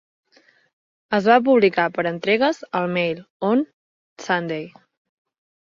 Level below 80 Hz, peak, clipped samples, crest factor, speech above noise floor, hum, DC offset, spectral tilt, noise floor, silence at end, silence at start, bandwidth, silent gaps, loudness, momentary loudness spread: -66 dBFS; -2 dBFS; under 0.1%; 20 dB; 38 dB; none; under 0.1%; -6 dB/octave; -58 dBFS; 1 s; 1.1 s; 7.6 kHz; 3.30-3.40 s, 3.73-4.16 s; -20 LUFS; 14 LU